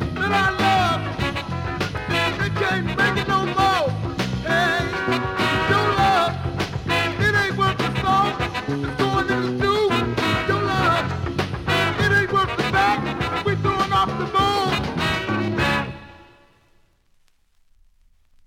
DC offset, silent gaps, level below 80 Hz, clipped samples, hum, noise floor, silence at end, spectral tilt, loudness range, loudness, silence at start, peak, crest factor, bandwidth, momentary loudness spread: under 0.1%; none; -40 dBFS; under 0.1%; none; -59 dBFS; 2.25 s; -5.5 dB/octave; 3 LU; -21 LUFS; 0 s; -6 dBFS; 16 dB; 16.5 kHz; 7 LU